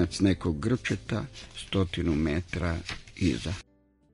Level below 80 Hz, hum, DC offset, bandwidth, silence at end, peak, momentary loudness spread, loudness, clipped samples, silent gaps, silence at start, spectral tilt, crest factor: -44 dBFS; none; under 0.1%; 11 kHz; 0.5 s; -10 dBFS; 12 LU; -30 LUFS; under 0.1%; none; 0 s; -6 dB/octave; 18 dB